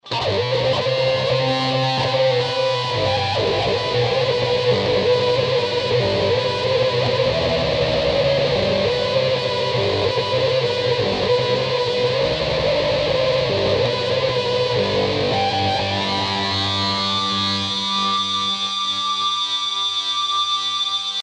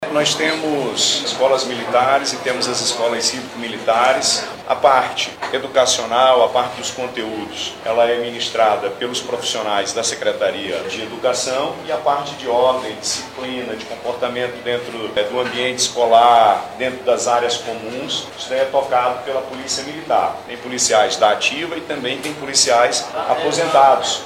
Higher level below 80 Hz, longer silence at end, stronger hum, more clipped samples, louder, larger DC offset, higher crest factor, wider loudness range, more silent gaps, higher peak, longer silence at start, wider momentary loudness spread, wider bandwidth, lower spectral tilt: first, -44 dBFS vs -60 dBFS; about the same, 0 s vs 0 s; neither; neither; about the same, -19 LUFS vs -18 LUFS; neither; about the same, 12 dB vs 16 dB; second, 1 LU vs 4 LU; neither; second, -6 dBFS vs -2 dBFS; about the same, 0.05 s vs 0 s; second, 2 LU vs 11 LU; second, 9.8 kHz vs 16 kHz; first, -4.5 dB/octave vs -1.5 dB/octave